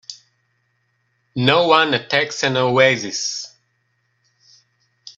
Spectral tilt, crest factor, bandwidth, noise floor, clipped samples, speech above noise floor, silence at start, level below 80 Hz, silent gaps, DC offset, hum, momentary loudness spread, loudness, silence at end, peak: -3.5 dB/octave; 20 dB; 8.2 kHz; -67 dBFS; under 0.1%; 50 dB; 0.1 s; -62 dBFS; none; under 0.1%; none; 16 LU; -17 LUFS; 0.05 s; 0 dBFS